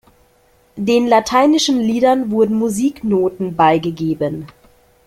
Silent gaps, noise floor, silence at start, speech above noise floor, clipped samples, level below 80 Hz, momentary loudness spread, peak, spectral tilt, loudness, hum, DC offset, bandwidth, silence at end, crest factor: none; -54 dBFS; 0.75 s; 39 dB; under 0.1%; -52 dBFS; 8 LU; -2 dBFS; -5 dB/octave; -15 LUFS; none; under 0.1%; 15.5 kHz; 0.6 s; 14 dB